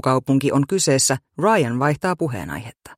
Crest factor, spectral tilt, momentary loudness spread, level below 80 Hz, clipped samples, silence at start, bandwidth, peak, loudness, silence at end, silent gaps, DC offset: 16 dB; -4.5 dB/octave; 10 LU; -52 dBFS; under 0.1%; 0.05 s; 16 kHz; -4 dBFS; -19 LUFS; 0.05 s; none; under 0.1%